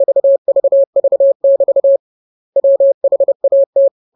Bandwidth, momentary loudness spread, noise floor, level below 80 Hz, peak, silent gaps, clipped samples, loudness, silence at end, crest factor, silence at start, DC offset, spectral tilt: 1 kHz; 3 LU; under -90 dBFS; -74 dBFS; -4 dBFS; 0.38-0.45 s, 0.87-0.93 s, 1.35-1.40 s, 1.99-2.53 s, 2.94-3.01 s, 3.35-3.40 s, 3.66-3.73 s; under 0.1%; -12 LUFS; 0.25 s; 8 dB; 0 s; under 0.1%; -12.5 dB/octave